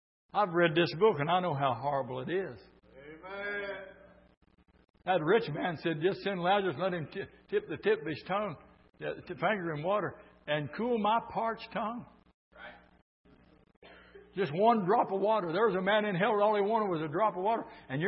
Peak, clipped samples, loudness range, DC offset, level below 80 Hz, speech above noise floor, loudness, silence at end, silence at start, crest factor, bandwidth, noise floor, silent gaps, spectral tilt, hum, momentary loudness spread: -14 dBFS; under 0.1%; 8 LU; under 0.1%; -68 dBFS; 25 dB; -31 LUFS; 0 s; 0.35 s; 18 dB; 5.8 kHz; -56 dBFS; 4.37-4.41 s, 4.90-4.94 s, 12.34-12.51 s, 13.02-13.24 s, 13.77-13.82 s; -9.5 dB/octave; none; 15 LU